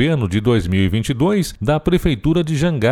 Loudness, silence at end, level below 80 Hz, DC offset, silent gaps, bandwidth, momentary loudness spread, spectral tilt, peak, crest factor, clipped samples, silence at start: -17 LUFS; 0 s; -32 dBFS; under 0.1%; none; 16.5 kHz; 2 LU; -6.5 dB/octave; -2 dBFS; 14 dB; under 0.1%; 0 s